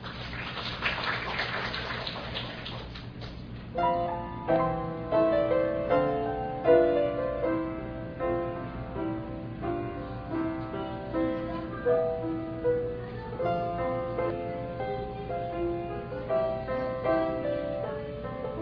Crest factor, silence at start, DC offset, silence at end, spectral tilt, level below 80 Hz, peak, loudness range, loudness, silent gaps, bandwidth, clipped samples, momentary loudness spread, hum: 20 dB; 0 s; under 0.1%; 0 s; -8 dB/octave; -48 dBFS; -10 dBFS; 7 LU; -30 LUFS; none; 5.4 kHz; under 0.1%; 10 LU; none